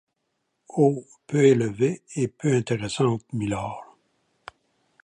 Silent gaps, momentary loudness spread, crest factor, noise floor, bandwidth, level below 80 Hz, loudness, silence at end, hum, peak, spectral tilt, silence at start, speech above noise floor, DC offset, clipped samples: none; 13 LU; 20 dB; -76 dBFS; 10.5 kHz; -58 dBFS; -24 LUFS; 1.2 s; none; -6 dBFS; -6.5 dB/octave; 0.75 s; 53 dB; under 0.1%; under 0.1%